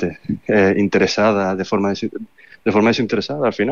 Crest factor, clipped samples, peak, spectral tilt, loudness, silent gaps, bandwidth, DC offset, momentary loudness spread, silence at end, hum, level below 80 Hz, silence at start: 14 dB; under 0.1%; -4 dBFS; -6 dB/octave; -18 LUFS; none; 7.2 kHz; 0.4%; 10 LU; 0 s; none; -56 dBFS; 0 s